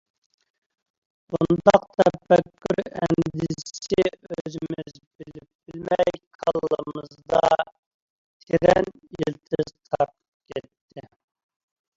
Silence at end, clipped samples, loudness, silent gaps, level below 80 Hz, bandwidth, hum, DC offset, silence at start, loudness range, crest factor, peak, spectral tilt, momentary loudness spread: 0.95 s; under 0.1%; -23 LUFS; 4.41-4.45 s, 5.07-5.11 s, 5.55-5.59 s, 6.27-6.39 s, 7.79-8.40 s, 10.28-10.40 s, 10.81-10.89 s; -54 dBFS; 7.8 kHz; none; under 0.1%; 1.3 s; 6 LU; 24 dB; 0 dBFS; -6.5 dB/octave; 18 LU